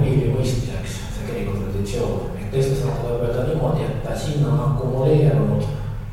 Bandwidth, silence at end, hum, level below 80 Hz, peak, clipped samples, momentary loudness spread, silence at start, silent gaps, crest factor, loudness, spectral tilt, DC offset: 14.5 kHz; 0 s; none; -32 dBFS; -6 dBFS; under 0.1%; 10 LU; 0 s; none; 14 dB; -22 LUFS; -7.5 dB/octave; under 0.1%